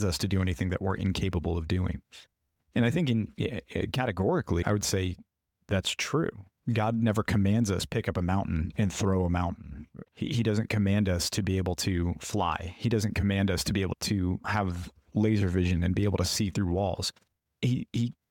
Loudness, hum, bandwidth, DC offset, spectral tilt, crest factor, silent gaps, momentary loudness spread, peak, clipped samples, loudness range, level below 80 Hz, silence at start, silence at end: -29 LUFS; none; 17.5 kHz; under 0.1%; -5.5 dB/octave; 14 dB; none; 7 LU; -14 dBFS; under 0.1%; 2 LU; -46 dBFS; 0 s; 0.2 s